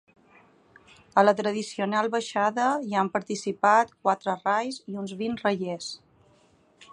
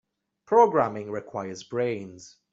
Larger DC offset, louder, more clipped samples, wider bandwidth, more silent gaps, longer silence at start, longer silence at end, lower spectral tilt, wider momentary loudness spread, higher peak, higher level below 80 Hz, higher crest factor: neither; about the same, -26 LUFS vs -25 LUFS; neither; first, 11 kHz vs 7.8 kHz; neither; first, 1.15 s vs 0.5 s; second, 0.1 s vs 0.25 s; second, -4.5 dB/octave vs -6 dB/octave; second, 12 LU vs 15 LU; about the same, -6 dBFS vs -6 dBFS; about the same, -72 dBFS vs -68 dBFS; about the same, 20 dB vs 20 dB